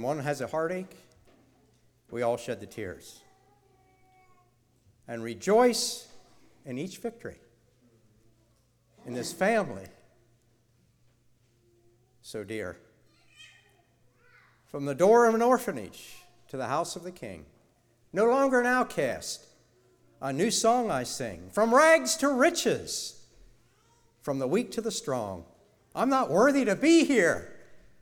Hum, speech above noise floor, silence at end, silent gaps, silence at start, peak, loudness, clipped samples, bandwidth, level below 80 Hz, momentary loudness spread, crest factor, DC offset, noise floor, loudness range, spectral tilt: none; 40 dB; 0.25 s; none; 0 s; -8 dBFS; -27 LUFS; under 0.1%; 19.5 kHz; -66 dBFS; 20 LU; 22 dB; under 0.1%; -67 dBFS; 17 LU; -4 dB/octave